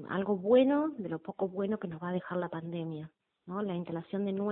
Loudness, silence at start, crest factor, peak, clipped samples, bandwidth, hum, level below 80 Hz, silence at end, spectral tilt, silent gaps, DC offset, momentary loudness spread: -33 LUFS; 0 s; 18 dB; -14 dBFS; under 0.1%; 4 kHz; none; -72 dBFS; 0 s; -11 dB/octave; none; under 0.1%; 14 LU